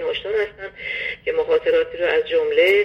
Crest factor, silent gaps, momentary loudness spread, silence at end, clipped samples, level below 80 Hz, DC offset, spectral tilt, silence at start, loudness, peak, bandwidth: 16 dB; none; 10 LU; 0 s; under 0.1%; -52 dBFS; under 0.1%; -4.5 dB/octave; 0 s; -20 LUFS; -4 dBFS; 13.5 kHz